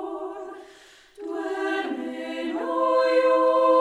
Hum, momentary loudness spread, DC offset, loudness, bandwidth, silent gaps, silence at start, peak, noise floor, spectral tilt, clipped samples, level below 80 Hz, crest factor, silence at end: none; 19 LU; under 0.1%; -24 LUFS; 10 kHz; none; 0 s; -8 dBFS; -51 dBFS; -3.5 dB/octave; under 0.1%; -70 dBFS; 16 dB; 0 s